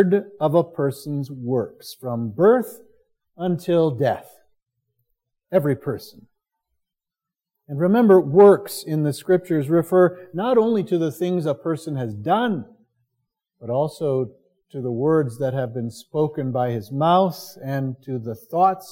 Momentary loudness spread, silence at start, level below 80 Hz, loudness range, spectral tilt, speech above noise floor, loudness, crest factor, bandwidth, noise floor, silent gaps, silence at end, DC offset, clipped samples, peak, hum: 13 LU; 0 s; -68 dBFS; 8 LU; -7.5 dB/octave; 67 dB; -21 LUFS; 20 dB; 17 kHz; -88 dBFS; none; 0 s; under 0.1%; under 0.1%; -2 dBFS; none